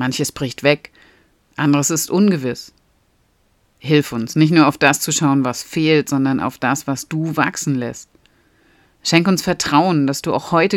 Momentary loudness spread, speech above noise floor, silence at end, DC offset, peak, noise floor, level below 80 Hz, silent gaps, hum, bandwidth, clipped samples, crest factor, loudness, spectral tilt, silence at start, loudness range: 9 LU; 43 dB; 0 s; under 0.1%; 0 dBFS; -60 dBFS; -54 dBFS; none; none; 17.5 kHz; under 0.1%; 18 dB; -17 LUFS; -4.5 dB/octave; 0 s; 4 LU